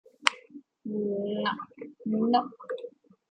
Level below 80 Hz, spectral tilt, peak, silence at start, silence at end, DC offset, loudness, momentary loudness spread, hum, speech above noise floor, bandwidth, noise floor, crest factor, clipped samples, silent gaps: -78 dBFS; -4 dB/octave; 0 dBFS; 0.25 s; 0.4 s; under 0.1%; -30 LUFS; 18 LU; none; 23 dB; 10 kHz; -51 dBFS; 32 dB; under 0.1%; none